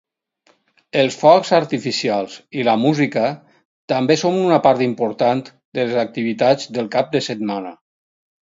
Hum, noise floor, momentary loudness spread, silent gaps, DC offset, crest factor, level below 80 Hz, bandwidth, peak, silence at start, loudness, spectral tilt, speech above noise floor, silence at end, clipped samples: none; -60 dBFS; 10 LU; 3.65-3.88 s, 5.65-5.72 s; under 0.1%; 18 dB; -64 dBFS; 7.8 kHz; 0 dBFS; 0.95 s; -18 LUFS; -5.5 dB/octave; 43 dB; 0.7 s; under 0.1%